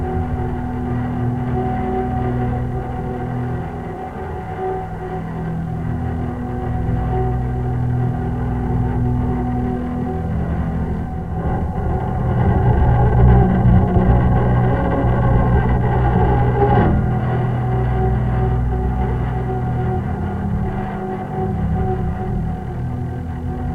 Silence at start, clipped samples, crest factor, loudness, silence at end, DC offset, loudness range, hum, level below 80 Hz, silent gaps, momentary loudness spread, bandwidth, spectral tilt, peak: 0 s; under 0.1%; 16 dB; -19 LUFS; 0 s; under 0.1%; 8 LU; none; -24 dBFS; none; 10 LU; 3.7 kHz; -10.5 dB/octave; -2 dBFS